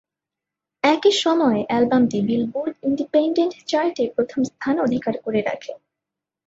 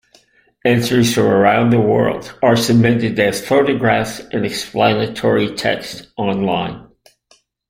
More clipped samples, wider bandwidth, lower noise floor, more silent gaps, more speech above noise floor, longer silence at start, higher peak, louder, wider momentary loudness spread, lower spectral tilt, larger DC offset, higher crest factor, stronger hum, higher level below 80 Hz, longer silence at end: neither; second, 8 kHz vs 16 kHz; first, -86 dBFS vs -56 dBFS; neither; first, 66 dB vs 41 dB; first, 0.85 s vs 0.65 s; second, -4 dBFS vs 0 dBFS; second, -21 LUFS vs -16 LUFS; about the same, 7 LU vs 9 LU; about the same, -5 dB/octave vs -5.5 dB/octave; neither; about the same, 18 dB vs 16 dB; neither; second, -62 dBFS vs -50 dBFS; second, 0.7 s vs 0.9 s